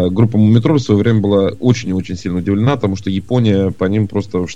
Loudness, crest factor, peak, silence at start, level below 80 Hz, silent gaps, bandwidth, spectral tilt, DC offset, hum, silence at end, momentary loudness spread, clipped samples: -15 LUFS; 14 dB; 0 dBFS; 0 s; -44 dBFS; none; 7.8 kHz; -7.5 dB/octave; 2%; none; 0 s; 8 LU; under 0.1%